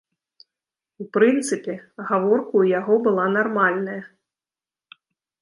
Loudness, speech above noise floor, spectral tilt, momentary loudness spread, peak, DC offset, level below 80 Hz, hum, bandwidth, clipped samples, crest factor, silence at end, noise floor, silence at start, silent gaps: -20 LUFS; over 70 dB; -5.5 dB/octave; 14 LU; -4 dBFS; under 0.1%; -76 dBFS; none; 11.5 kHz; under 0.1%; 18 dB; 1.35 s; under -90 dBFS; 1 s; none